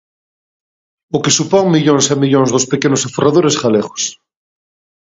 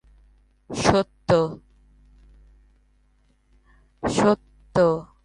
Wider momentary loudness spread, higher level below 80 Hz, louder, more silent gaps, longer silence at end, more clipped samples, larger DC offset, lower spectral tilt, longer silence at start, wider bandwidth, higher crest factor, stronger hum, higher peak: about the same, 8 LU vs 10 LU; second, -56 dBFS vs -48 dBFS; first, -13 LUFS vs -22 LUFS; neither; first, 0.9 s vs 0.2 s; neither; neither; about the same, -4.5 dB/octave vs -5.5 dB/octave; first, 1.15 s vs 0.7 s; second, 8 kHz vs 11.5 kHz; second, 14 dB vs 22 dB; second, none vs 50 Hz at -55 dBFS; first, 0 dBFS vs -4 dBFS